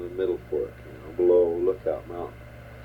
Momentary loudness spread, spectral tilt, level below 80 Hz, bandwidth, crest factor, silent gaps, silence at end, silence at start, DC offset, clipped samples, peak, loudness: 21 LU; -8.5 dB/octave; -50 dBFS; 4.9 kHz; 16 dB; none; 0 s; 0 s; under 0.1%; under 0.1%; -10 dBFS; -25 LUFS